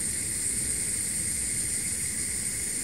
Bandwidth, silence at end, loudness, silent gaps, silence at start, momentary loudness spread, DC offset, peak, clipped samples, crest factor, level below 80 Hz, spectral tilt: 16 kHz; 0 s; -27 LUFS; none; 0 s; 1 LU; 0.3%; -14 dBFS; under 0.1%; 14 dB; -48 dBFS; -1 dB/octave